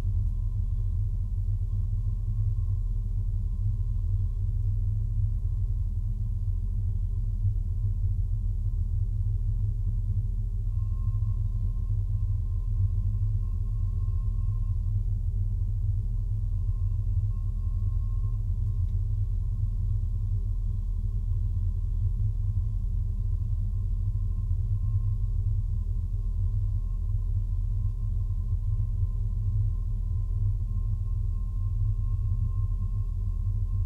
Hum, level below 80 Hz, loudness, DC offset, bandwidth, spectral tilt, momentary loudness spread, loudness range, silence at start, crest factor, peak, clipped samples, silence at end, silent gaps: none; -30 dBFS; -31 LUFS; under 0.1%; 1.1 kHz; -10.5 dB/octave; 2 LU; 1 LU; 0 s; 12 dB; -16 dBFS; under 0.1%; 0 s; none